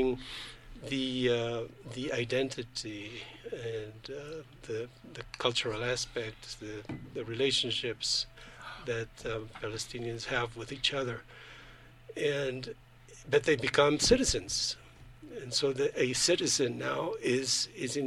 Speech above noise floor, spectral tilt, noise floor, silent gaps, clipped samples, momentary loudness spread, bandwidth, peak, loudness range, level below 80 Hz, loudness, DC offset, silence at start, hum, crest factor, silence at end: 21 dB; -3 dB/octave; -54 dBFS; none; under 0.1%; 18 LU; 14 kHz; -10 dBFS; 8 LU; -54 dBFS; -32 LUFS; under 0.1%; 0 s; none; 24 dB; 0 s